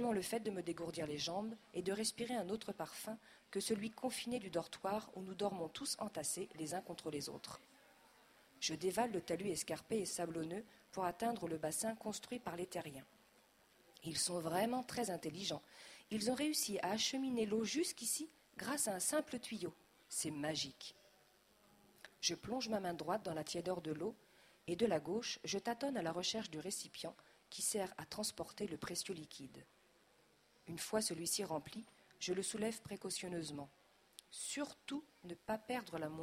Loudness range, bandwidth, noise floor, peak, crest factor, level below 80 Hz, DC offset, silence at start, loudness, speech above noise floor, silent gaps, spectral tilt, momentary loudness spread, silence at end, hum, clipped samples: 5 LU; 16 kHz; -72 dBFS; -22 dBFS; 22 dB; -76 dBFS; under 0.1%; 0 s; -42 LUFS; 30 dB; none; -3 dB/octave; 13 LU; 0 s; none; under 0.1%